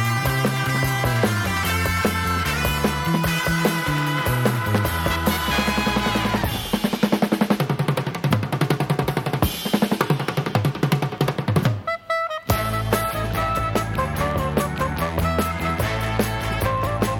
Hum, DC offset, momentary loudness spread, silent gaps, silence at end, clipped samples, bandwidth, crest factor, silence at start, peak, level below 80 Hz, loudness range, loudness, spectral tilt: none; under 0.1%; 3 LU; none; 0 s; under 0.1%; 19 kHz; 20 dB; 0 s; -2 dBFS; -36 dBFS; 2 LU; -22 LUFS; -5.5 dB/octave